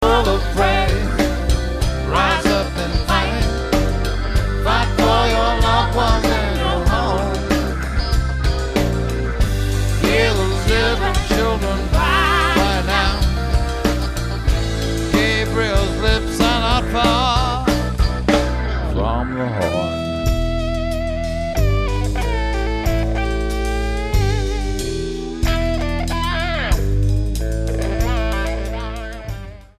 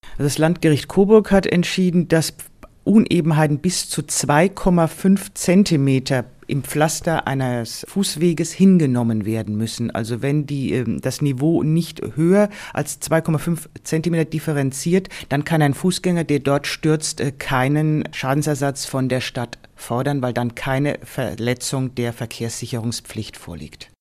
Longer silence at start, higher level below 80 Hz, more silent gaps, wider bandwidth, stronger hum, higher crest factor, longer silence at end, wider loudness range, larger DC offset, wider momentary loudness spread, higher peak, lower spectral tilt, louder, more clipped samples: about the same, 0 s vs 0.05 s; first, -22 dBFS vs -44 dBFS; neither; second, 14.5 kHz vs 16 kHz; neither; about the same, 16 dB vs 18 dB; about the same, 0.15 s vs 0.15 s; about the same, 4 LU vs 6 LU; neither; second, 7 LU vs 10 LU; about the same, -2 dBFS vs 0 dBFS; about the same, -5.5 dB/octave vs -5.5 dB/octave; about the same, -19 LUFS vs -19 LUFS; neither